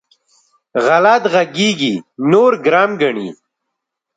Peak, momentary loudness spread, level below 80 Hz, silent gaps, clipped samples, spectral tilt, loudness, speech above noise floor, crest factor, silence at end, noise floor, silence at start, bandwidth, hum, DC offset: 0 dBFS; 9 LU; -64 dBFS; none; under 0.1%; -5 dB/octave; -14 LUFS; 64 dB; 16 dB; 0.85 s; -77 dBFS; 0.75 s; 9.2 kHz; none; under 0.1%